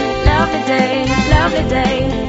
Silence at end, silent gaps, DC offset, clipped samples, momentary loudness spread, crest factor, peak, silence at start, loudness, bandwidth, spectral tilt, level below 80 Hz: 0 s; none; under 0.1%; under 0.1%; 2 LU; 14 dB; 0 dBFS; 0 s; -14 LUFS; 8 kHz; -4.5 dB/octave; -22 dBFS